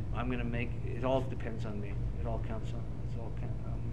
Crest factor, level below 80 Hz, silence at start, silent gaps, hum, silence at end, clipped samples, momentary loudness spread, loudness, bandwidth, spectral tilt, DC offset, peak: 18 dB; -42 dBFS; 0 s; none; none; 0 s; under 0.1%; 7 LU; -37 LUFS; 8.4 kHz; -8.5 dB/octave; 1%; -16 dBFS